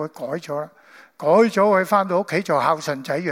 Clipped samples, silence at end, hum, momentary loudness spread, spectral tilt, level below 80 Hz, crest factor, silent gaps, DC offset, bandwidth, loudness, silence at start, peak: under 0.1%; 0 s; none; 13 LU; -5.5 dB/octave; -74 dBFS; 16 dB; none; under 0.1%; 16.5 kHz; -20 LUFS; 0 s; -4 dBFS